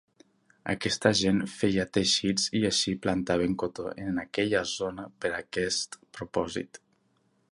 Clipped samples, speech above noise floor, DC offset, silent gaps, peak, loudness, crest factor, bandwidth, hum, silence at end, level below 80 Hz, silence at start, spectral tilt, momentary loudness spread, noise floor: under 0.1%; 41 dB; under 0.1%; none; -6 dBFS; -28 LUFS; 24 dB; 11.5 kHz; none; 0.75 s; -56 dBFS; 0.65 s; -3.5 dB/octave; 11 LU; -70 dBFS